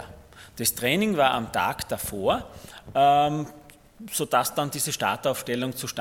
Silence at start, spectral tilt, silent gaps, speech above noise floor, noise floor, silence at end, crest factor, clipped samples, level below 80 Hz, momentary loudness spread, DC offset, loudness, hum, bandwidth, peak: 0 s; -3.5 dB/octave; none; 22 dB; -47 dBFS; 0 s; 20 dB; under 0.1%; -54 dBFS; 16 LU; under 0.1%; -25 LUFS; none; 17.5 kHz; -6 dBFS